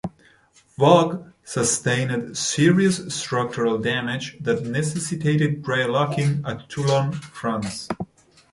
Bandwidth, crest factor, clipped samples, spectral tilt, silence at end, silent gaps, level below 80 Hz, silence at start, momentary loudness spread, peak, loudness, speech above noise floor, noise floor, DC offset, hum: 11.5 kHz; 20 dB; under 0.1%; -5 dB/octave; 0.45 s; none; -56 dBFS; 0.05 s; 12 LU; -2 dBFS; -22 LUFS; 29 dB; -50 dBFS; under 0.1%; none